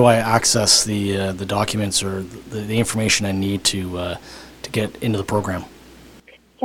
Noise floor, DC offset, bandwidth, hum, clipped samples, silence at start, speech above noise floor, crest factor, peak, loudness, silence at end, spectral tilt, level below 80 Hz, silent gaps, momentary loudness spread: -48 dBFS; under 0.1%; 18 kHz; none; under 0.1%; 0 s; 28 dB; 20 dB; 0 dBFS; -19 LUFS; 0 s; -3.5 dB/octave; -48 dBFS; none; 16 LU